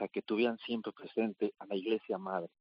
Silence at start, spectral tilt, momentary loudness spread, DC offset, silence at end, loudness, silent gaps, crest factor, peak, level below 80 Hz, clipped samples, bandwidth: 0 s; -4 dB/octave; 6 LU; under 0.1%; 0.15 s; -36 LUFS; none; 16 dB; -20 dBFS; -86 dBFS; under 0.1%; 5.4 kHz